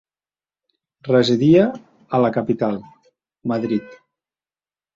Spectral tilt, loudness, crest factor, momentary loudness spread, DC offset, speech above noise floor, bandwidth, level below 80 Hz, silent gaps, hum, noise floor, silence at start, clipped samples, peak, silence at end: -7.5 dB/octave; -19 LUFS; 18 dB; 17 LU; under 0.1%; over 73 dB; 7.6 kHz; -58 dBFS; none; none; under -90 dBFS; 1.05 s; under 0.1%; -2 dBFS; 1 s